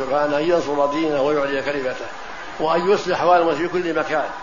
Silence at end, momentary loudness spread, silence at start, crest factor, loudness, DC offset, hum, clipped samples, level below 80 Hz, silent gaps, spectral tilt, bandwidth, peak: 0 s; 10 LU; 0 s; 16 dB; -20 LUFS; 1%; none; under 0.1%; -50 dBFS; none; -5 dB/octave; 7.4 kHz; -2 dBFS